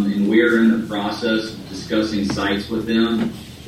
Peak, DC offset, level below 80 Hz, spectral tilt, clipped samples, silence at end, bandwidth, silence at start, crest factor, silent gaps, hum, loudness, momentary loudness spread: -4 dBFS; under 0.1%; -46 dBFS; -5.5 dB/octave; under 0.1%; 0 s; 14.5 kHz; 0 s; 14 dB; none; none; -19 LUFS; 9 LU